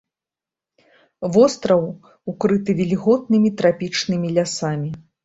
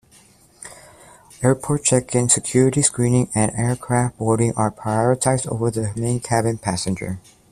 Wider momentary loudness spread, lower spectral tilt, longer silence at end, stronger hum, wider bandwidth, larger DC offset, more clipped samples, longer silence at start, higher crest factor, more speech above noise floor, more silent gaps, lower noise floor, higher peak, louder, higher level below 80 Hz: first, 14 LU vs 10 LU; about the same, -6 dB/octave vs -5 dB/octave; about the same, 0.25 s vs 0.3 s; neither; second, 8 kHz vs 13.5 kHz; neither; neither; first, 1.2 s vs 0.6 s; about the same, 18 dB vs 20 dB; first, 70 dB vs 32 dB; neither; first, -89 dBFS vs -52 dBFS; about the same, -2 dBFS vs 0 dBFS; about the same, -19 LUFS vs -20 LUFS; second, -58 dBFS vs -48 dBFS